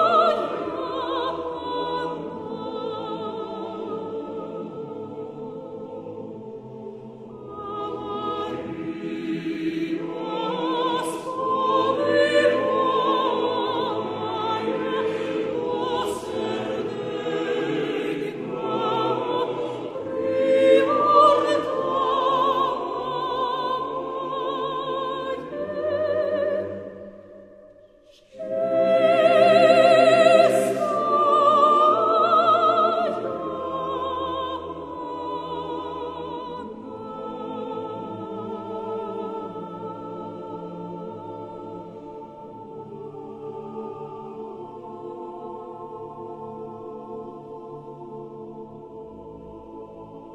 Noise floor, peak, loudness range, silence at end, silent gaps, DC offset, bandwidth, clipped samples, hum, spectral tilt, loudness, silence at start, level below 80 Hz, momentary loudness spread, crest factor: -53 dBFS; -4 dBFS; 19 LU; 0 s; none; under 0.1%; 14 kHz; under 0.1%; none; -5 dB/octave; -23 LUFS; 0 s; -62 dBFS; 21 LU; 20 dB